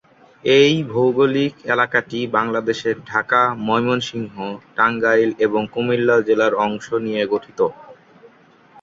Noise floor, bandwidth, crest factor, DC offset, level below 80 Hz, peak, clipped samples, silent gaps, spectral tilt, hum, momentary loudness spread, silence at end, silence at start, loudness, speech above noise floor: -50 dBFS; 7.6 kHz; 18 dB; under 0.1%; -62 dBFS; -2 dBFS; under 0.1%; none; -5.5 dB/octave; none; 7 LU; 0.9 s; 0.45 s; -18 LUFS; 32 dB